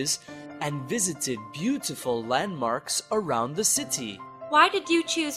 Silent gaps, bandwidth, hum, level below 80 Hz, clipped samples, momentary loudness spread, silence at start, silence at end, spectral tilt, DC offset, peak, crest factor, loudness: none; 15.5 kHz; none; -66 dBFS; under 0.1%; 12 LU; 0 s; 0 s; -2.5 dB/octave; under 0.1%; -4 dBFS; 22 dB; -26 LUFS